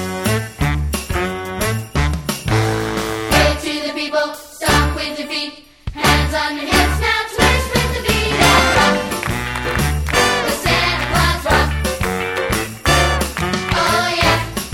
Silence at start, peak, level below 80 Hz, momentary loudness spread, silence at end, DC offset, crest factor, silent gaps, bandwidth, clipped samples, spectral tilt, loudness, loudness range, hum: 0 s; 0 dBFS; -26 dBFS; 7 LU; 0 s; under 0.1%; 18 dB; none; 17.5 kHz; under 0.1%; -4 dB/octave; -17 LUFS; 4 LU; none